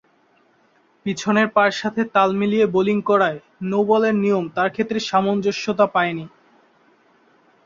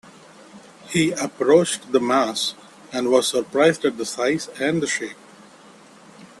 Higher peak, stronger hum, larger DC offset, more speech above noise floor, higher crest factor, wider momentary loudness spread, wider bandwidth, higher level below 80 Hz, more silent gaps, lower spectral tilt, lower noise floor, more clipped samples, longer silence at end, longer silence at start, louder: about the same, -2 dBFS vs -2 dBFS; neither; neither; first, 40 dB vs 27 dB; about the same, 18 dB vs 20 dB; about the same, 7 LU vs 9 LU; second, 7.6 kHz vs 13 kHz; about the same, -62 dBFS vs -64 dBFS; neither; first, -5.5 dB/octave vs -4 dB/octave; first, -59 dBFS vs -47 dBFS; neither; first, 1.4 s vs 0.2 s; first, 1.05 s vs 0.55 s; about the same, -19 LUFS vs -21 LUFS